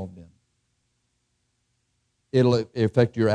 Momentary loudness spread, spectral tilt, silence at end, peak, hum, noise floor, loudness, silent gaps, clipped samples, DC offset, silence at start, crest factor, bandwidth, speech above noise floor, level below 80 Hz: 5 LU; -8 dB/octave; 0 s; -6 dBFS; 60 Hz at -50 dBFS; -73 dBFS; -22 LUFS; none; under 0.1%; under 0.1%; 0 s; 20 dB; 9.6 kHz; 53 dB; -62 dBFS